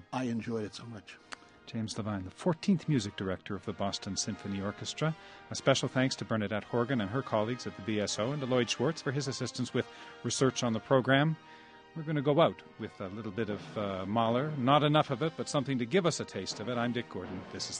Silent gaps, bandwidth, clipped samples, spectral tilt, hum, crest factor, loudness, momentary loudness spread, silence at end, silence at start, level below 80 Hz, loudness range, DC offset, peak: none; 10 kHz; under 0.1%; -5 dB/octave; none; 22 dB; -32 LUFS; 14 LU; 0 s; 0.1 s; -68 dBFS; 4 LU; under 0.1%; -12 dBFS